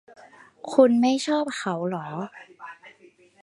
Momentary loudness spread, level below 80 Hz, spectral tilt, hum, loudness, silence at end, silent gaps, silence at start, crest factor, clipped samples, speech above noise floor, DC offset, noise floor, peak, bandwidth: 24 LU; -78 dBFS; -5.5 dB/octave; none; -23 LUFS; 0.55 s; none; 0.65 s; 22 dB; under 0.1%; 33 dB; under 0.1%; -55 dBFS; -4 dBFS; 11.5 kHz